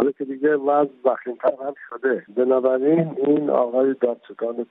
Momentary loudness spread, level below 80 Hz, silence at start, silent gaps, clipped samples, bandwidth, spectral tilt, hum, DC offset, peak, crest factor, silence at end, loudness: 9 LU; -76 dBFS; 0 s; none; under 0.1%; 3.9 kHz; -11 dB/octave; none; under 0.1%; -6 dBFS; 16 dB; 0.05 s; -21 LUFS